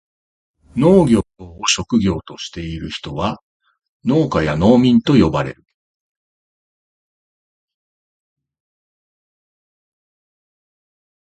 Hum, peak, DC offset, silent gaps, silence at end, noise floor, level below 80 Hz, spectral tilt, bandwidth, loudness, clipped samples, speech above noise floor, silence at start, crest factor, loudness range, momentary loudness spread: none; 0 dBFS; under 0.1%; 3.43-3.60 s, 3.88-4.00 s; 5.8 s; under -90 dBFS; -40 dBFS; -5.5 dB/octave; 11 kHz; -16 LUFS; under 0.1%; over 74 dB; 0.75 s; 20 dB; 4 LU; 15 LU